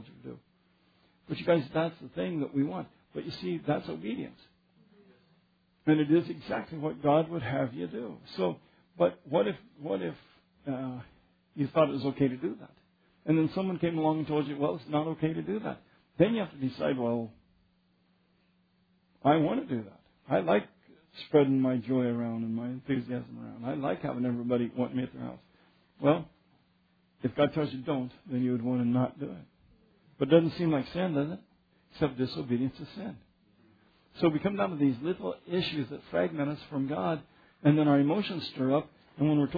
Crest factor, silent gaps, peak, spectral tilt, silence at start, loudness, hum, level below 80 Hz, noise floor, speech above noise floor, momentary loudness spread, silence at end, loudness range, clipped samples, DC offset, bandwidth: 22 dB; none; -10 dBFS; -9.5 dB/octave; 0 s; -31 LUFS; none; -66 dBFS; -69 dBFS; 40 dB; 15 LU; 0 s; 4 LU; under 0.1%; under 0.1%; 5 kHz